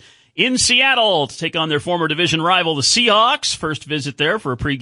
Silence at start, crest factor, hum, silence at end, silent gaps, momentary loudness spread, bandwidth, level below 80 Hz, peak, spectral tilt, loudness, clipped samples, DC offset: 0.35 s; 16 dB; none; 0 s; none; 10 LU; 11.5 kHz; -46 dBFS; -2 dBFS; -2.5 dB/octave; -16 LUFS; under 0.1%; under 0.1%